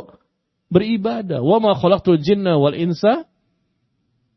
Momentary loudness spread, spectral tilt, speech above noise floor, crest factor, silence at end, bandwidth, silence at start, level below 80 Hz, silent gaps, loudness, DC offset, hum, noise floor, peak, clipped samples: 6 LU; -8.5 dB/octave; 53 dB; 18 dB; 1.15 s; 6.2 kHz; 0 s; -52 dBFS; none; -17 LUFS; under 0.1%; none; -69 dBFS; -2 dBFS; under 0.1%